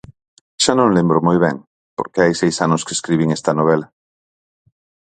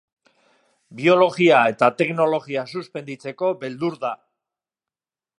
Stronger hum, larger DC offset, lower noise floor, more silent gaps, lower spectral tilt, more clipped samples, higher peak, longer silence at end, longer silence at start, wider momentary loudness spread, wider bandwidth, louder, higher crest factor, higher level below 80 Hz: neither; neither; about the same, under -90 dBFS vs under -90 dBFS; first, 1.67-1.97 s vs none; about the same, -5 dB/octave vs -6 dB/octave; neither; about the same, 0 dBFS vs -2 dBFS; about the same, 1.3 s vs 1.25 s; second, 0.6 s vs 0.9 s; second, 8 LU vs 16 LU; second, 9.4 kHz vs 11.5 kHz; first, -16 LUFS vs -20 LUFS; about the same, 18 dB vs 20 dB; first, -54 dBFS vs -74 dBFS